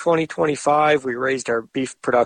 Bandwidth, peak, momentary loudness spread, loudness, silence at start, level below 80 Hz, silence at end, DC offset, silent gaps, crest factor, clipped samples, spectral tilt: 10 kHz; -4 dBFS; 7 LU; -20 LUFS; 0 s; -60 dBFS; 0 s; under 0.1%; none; 16 dB; under 0.1%; -4.5 dB/octave